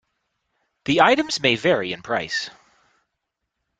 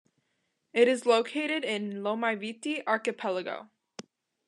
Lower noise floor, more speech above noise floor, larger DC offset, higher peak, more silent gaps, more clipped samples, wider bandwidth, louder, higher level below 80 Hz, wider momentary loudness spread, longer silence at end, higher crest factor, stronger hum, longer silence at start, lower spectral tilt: about the same, -80 dBFS vs -78 dBFS; first, 59 dB vs 49 dB; neither; first, -2 dBFS vs -8 dBFS; neither; neither; second, 9.4 kHz vs 11 kHz; first, -20 LUFS vs -29 LUFS; first, -60 dBFS vs under -90 dBFS; second, 11 LU vs 20 LU; first, 1.3 s vs 0.45 s; about the same, 22 dB vs 22 dB; neither; about the same, 0.85 s vs 0.75 s; about the same, -4 dB/octave vs -4 dB/octave